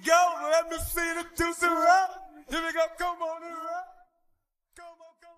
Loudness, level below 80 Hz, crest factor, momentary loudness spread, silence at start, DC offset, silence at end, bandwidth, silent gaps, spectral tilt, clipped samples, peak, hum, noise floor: -27 LUFS; -50 dBFS; 20 dB; 14 LU; 0 s; under 0.1%; 0.3 s; 15 kHz; none; -2.5 dB/octave; under 0.1%; -8 dBFS; none; -73 dBFS